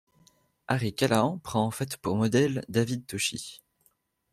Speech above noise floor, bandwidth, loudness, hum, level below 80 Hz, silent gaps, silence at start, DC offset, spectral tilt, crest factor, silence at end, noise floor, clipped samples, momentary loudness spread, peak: 43 dB; 15 kHz; -28 LUFS; none; -62 dBFS; none; 0.7 s; under 0.1%; -5 dB/octave; 20 dB; 0.75 s; -70 dBFS; under 0.1%; 7 LU; -8 dBFS